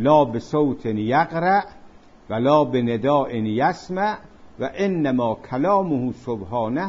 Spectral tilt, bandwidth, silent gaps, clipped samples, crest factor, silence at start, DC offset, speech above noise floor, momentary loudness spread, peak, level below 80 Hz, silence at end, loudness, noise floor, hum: -7.5 dB/octave; 7.6 kHz; none; under 0.1%; 16 dB; 0 s; under 0.1%; 26 dB; 9 LU; -4 dBFS; -54 dBFS; 0 s; -21 LUFS; -46 dBFS; none